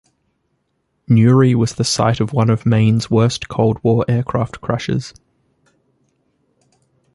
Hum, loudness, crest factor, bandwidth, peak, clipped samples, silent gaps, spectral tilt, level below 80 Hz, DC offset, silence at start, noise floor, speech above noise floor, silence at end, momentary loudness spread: none; -16 LUFS; 16 dB; 11.5 kHz; -2 dBFS; under 0.1%; none; -6.5 dB/octave; -46 dBFS; under 0.1%; 1.1 s; -68 dBFS; 53 dB; 2.05 s; 9 LU